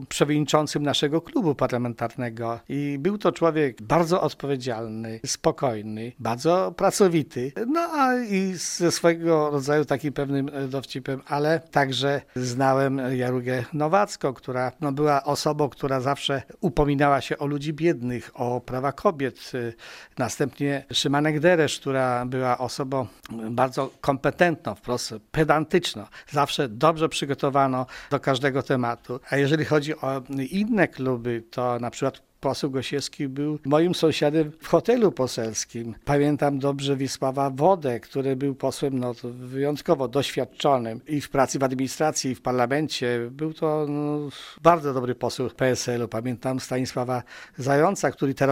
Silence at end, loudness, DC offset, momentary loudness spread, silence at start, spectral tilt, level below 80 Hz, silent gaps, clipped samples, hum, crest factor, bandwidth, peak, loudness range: 0 s; -25 LUFS; under 0.1%; 9 LU; 0 s; -5 dB/octave; -52 dBFS; none; under 0.1%; none; 22 dB; 16 kHz; -2 dBFS; 2 LU